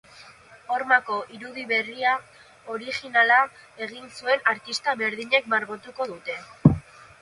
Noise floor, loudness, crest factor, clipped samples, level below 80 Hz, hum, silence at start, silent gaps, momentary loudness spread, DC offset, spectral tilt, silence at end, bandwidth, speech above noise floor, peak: -49 dBFS; -24 LUFS; 26 dB; under 0.1%; -52 dBFS; none; 0.15 s; none; 15 LU; under 0.1%; -5.5 dB/octave; 0.4 s; 11.5 kHz; 24 dB; 0 dBFS